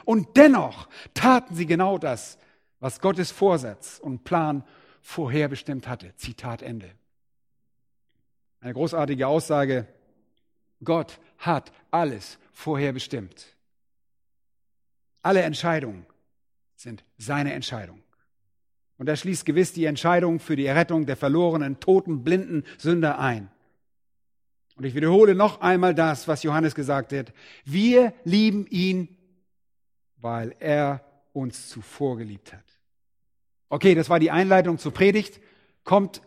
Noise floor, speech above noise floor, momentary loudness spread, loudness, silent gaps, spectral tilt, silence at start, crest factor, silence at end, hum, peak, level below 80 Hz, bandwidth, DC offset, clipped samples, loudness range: -86 dBFS; 64 dB; 18 LU; -23 LUFS; none; -6.5 dB/octave; 0.05 s; 24 dB; 0.1 s; none; 0 dBFS; -62 dBFS; 15 kHz; under 0.1%; under 0.1%; 10 LU